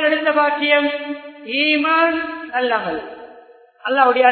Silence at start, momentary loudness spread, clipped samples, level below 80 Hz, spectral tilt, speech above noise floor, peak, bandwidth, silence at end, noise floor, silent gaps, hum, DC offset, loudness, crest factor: 0 s; 15 LU; under 0.1%; -62 dBFS; -8 dB/octave; 29 dB; 0 dBFS; 4.6 kHz; 0 s; -46 dBFS; none; none; under 0.1%; -17 LUFS; 18 dB